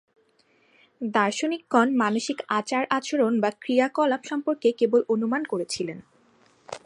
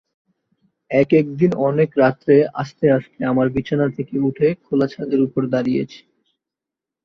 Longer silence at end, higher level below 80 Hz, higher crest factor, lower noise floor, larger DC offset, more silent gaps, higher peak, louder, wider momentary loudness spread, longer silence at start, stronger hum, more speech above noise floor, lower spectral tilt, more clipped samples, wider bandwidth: second, 0.05 s vs 1.1 s; second, -76 dBFS vs -56 dBFS; about the same, 20 dB vs 16 dB; second, -64 dBFS vs -86 dBFS; neither; neither; second, -6 dBFS vs -2 dBFS; second, -24 LUFS vs -18 LUFS; about the same, 8 LU vs 6 LU; about the same, 1 s vs 0.9 s; neither; second, 40 dB vs 69 dB; second, -4.5 dB/octave vs -9 dB/octave; neither; first, 11 kHz vs 6.4 kHz